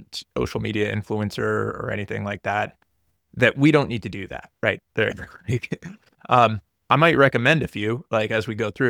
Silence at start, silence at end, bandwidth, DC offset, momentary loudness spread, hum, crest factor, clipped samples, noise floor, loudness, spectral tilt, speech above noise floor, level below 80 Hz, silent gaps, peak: 0 s; 0 s; 16.5 kHz; under 0.1%; 15 LU; none; 20 dB; under 0.1%; -71 dBFS; -22 LUFS; -6.5 dB/octave; 49 dB; -50 dBFS; none; -2 dBFS